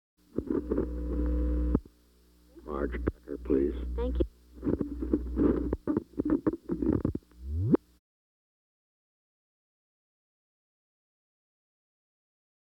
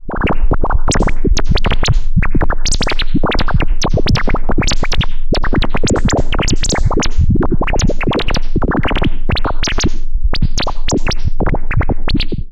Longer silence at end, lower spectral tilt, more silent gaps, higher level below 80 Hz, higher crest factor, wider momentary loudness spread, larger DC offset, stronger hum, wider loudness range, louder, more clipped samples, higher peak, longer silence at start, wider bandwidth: first, 5.05 s vs 0 s; first, -10.5 dB/octave vs -4.5 dB/octave; neither; second, -38 dBFS vs -14 dBFS; first, 22 dB vs 8 dB; first, 9 LU vs 3 LU; neither; first, 60 Hz at -45 dBFS vs none; first, 5 LU vs 2 LU; second, -32 LUFS vs -17 LUFS; neither; second, -10 dBFS vs -2 dBFS; first, 0.35 s vs 0.05 s; second, 5.2 kHz vs 9.2 kHz